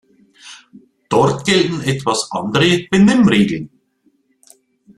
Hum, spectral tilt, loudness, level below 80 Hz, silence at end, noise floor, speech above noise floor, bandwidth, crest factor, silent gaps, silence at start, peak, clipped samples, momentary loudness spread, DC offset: none; -5 dB/octave; -15 LUFS; -50 dBFS; 1.3 s; -60 dBFS; 46 dB; 12.5 kHz; 16 dB; none; 0.45 s; 0 dBFS; under 0.1%; 8 LU; under 0.1%